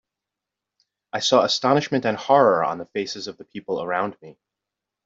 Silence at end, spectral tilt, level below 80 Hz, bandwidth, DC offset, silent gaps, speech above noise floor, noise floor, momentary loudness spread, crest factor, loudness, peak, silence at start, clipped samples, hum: 0.75 s; -4 dB/octave; -68 dBFS; 8 kHz; under 0.1%; none; 64 dB; -86 dBFS; 15 LU; 20 dB; -21 LUFS; -4 dBFS; 1.15 s; under 0.1%; none